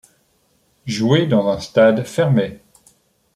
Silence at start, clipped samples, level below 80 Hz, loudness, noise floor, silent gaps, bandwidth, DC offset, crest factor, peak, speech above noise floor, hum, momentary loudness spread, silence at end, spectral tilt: 0.85 s; under 0.1%; -56 dBFS; -17 LUFS; -61 dBFS; none; 13.5 kHz; under 0.1%; 16 dB; -2 dBFS; 45 dB; none; 13 LU; 0.8 s; -6.5 dB/octave